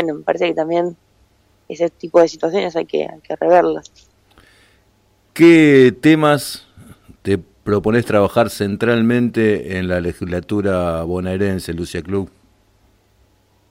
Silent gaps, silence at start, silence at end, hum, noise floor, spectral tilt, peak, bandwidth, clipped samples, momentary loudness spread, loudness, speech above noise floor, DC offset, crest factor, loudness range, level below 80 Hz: none; 0 s; 1.45 s; none; -57 dBFS; -6.5 dB/octave; -2 dBFS; 16 kHz; under 0.1%; 14 LU; -16 LUFS; 42 dB; under 0.1%; 16 dB; 7 LU; -50 dBFS